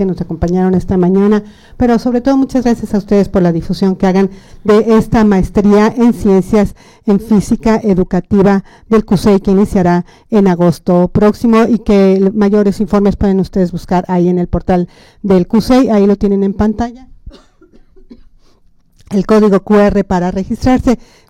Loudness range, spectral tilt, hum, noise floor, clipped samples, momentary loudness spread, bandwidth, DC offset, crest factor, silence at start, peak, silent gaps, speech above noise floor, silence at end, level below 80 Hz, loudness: 4 LU; -8 dB/octave; none; -47 dBFS; under 0.1%; 6 LU; 12.5 kHz; under 0.1%; 10 dB; 0 s; 0 dBFS; none; 36 dB; 0.35 s; -30 dBFS; -11 LUFS